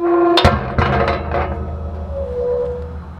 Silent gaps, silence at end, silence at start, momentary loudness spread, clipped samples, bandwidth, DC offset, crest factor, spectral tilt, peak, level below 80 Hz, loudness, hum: none; 0 s; 0 s; 13 LU; under 0.1%; 12 kHz; under 0.1%; 16 dB; -7 dB/octave; 0 dBFS; -26 dBFS; -18 LUFS; none